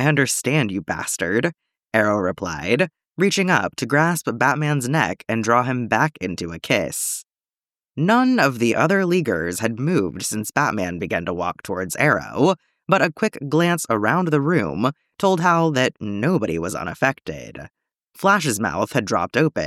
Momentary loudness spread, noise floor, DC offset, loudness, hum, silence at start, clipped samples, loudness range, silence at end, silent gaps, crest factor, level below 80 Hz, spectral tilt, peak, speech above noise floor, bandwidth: 8 LU; under -90 dBFS; under 0.1%; -20 LUFS; none; 0 s; under 0.1%; 2 LU; 0 s; none; 18 dB; -54 dBFS; -5 dB/octave; -2 dBFS; over 70 dB; 16 kHz